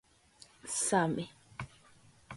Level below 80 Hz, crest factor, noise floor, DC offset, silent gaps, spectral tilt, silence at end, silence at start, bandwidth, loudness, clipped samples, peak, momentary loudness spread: -68 dBFS; 24 dB; -62 dBFS; under 0.1%; none; -4 dB/octave; 0 s; 0.65 s; 11.5 kHz; -33 LUFS; under 0.1%; -14 dBFS; 19 LU